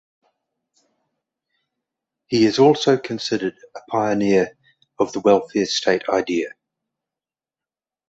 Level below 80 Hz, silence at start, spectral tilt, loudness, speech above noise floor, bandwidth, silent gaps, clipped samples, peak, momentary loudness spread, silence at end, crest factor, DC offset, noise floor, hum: -62 dBFS; 2.3 s; -5 dB/octave; -19 LUFS; over 71 dB; 8 kHz; none; under 0.1%; -2 dBFS; 10 LU; 1.6 s; 20 dB; under 0.1%; under -90 dBFS; none